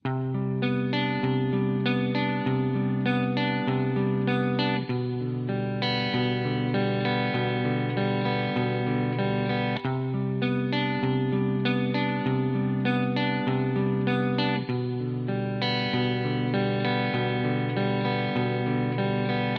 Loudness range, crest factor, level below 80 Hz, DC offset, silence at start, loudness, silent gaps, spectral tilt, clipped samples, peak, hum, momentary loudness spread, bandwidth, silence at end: 1 LU; 14 dB; -60 dBFS; under 0.1%; 0.05 s; -26 LUFS; none; -9 dB/octave; under 0.1%; -12 dBFS; none; 3 LU; 5.8 kHz; 0 s